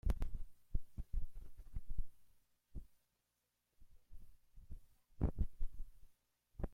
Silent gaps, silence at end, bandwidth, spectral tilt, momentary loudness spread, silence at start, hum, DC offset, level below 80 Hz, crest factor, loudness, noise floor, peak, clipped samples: none; 0 s; 3.2 kHz; -8.5 dB/octave; 24 LU; 0.05 s; 60 Hz at -75 dBFS; under 0.1%; -46 dBFS; 20 dB; -49 LUFS; -86 dBFS; -22 dBFS; under 0.1%